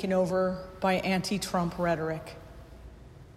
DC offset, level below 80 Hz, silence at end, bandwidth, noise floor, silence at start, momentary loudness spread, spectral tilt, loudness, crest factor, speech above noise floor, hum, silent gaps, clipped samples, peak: under 0.1%; -52 dBFS; 0.05 s; 14.5 kHz; -49 dBFS; 0 s; 23 LU; -5.5 dB/octave; -29 LUFS; 16 dB; 20 dB; none; none; under 0.1%; -14 dBFS